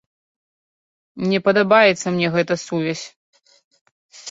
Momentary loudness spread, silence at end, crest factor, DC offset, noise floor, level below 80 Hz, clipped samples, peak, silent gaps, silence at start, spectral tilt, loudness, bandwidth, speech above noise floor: 16 LU; 0 s; 20 dB; under 0.1%; under -90 dBFS; -64 dBFS; under 0.1%; -2 dBFS; 3.16-3.33 s, 3.64-3.71 s, 3.81-3.85 s, 3.92-4.09 s; 1.15 s; -5 dB/octave; -18 LUFS; 8 kHz; over 72 dB